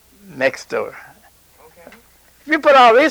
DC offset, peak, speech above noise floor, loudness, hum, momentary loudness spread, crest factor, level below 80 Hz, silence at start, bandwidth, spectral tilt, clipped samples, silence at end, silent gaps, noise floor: under 0.1%; 0 dBFS; 37 dB; -14 LUFS; none; 16 LU; 16 dB; -60 dBFS; 0.35 s; over 20 kHz; -3.5 dB/octave; under 0.1%; 0 s; none; -50 dBFS